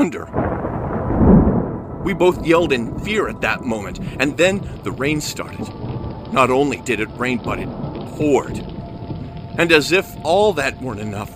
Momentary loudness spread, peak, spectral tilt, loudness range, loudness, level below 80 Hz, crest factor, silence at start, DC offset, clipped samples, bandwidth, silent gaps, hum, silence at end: 14 LU; 0 dBFS; -5.5 dB/octave; 4 LU; -19 LUFS; -34 dBFS; 18 dB; 0 s; under 0.1%; under 0.1%; 15.5 kHz; none; none; 0 s